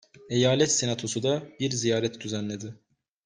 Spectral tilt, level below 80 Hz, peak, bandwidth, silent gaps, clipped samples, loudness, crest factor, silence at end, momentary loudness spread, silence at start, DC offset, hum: -4 dB/octave; -64 dBFS; -8 dBFS; 10 kHz; none; under 0.1%; -26 LUFS; 20 dB; 0.5 s; 11 LU; 0.2 s; under 0.1%; none